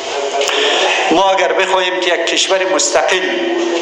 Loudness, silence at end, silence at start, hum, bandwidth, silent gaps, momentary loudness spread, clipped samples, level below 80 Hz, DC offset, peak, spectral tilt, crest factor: -13 LUFS; 0 s; 0 s; none; 11.5 kHz; none; 4 LU; under 0.1%; -58 dBFS; under 0.1%; 0 dBFS; -0.5 dB/octave; 14 dB